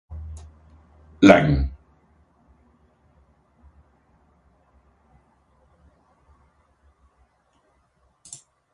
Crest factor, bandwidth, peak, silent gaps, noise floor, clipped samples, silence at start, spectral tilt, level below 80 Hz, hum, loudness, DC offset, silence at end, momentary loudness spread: 26 dB; 11 kHz; 0 dBFS; none; -65 dBFS; under 0.1%; 0.1 s; -6.5 dB/octave; -40 dBFS; none; -17 LUFS; under 0.1%; 7 s; 29 LU